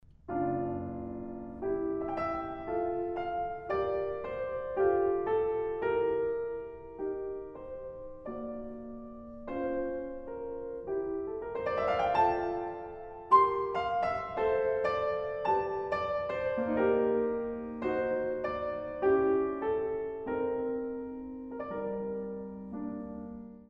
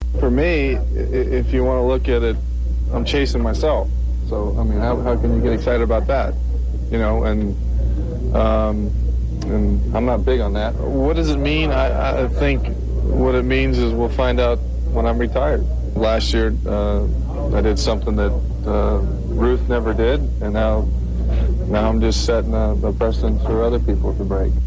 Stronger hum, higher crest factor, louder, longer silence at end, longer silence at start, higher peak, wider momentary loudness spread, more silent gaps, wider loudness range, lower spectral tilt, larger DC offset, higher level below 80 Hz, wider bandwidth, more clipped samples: neither; first, 20 dB vs 14 dB; second, -33 LUFS vs -19 LUFS; about the same, 0.05 s vs 0 s; first, 0.25 s vs 0 s; second, -12 dBFS vs -4 dBFS; first, 14 LU vs 5 LU; neither; first, 9 LU vs 1 LU; about the same, -8 dB/octave vs -7 dB/octave; neither; second, -58 dBFS vs -20 dBFS; second, 6 kHz vs 7.8 kHz; neither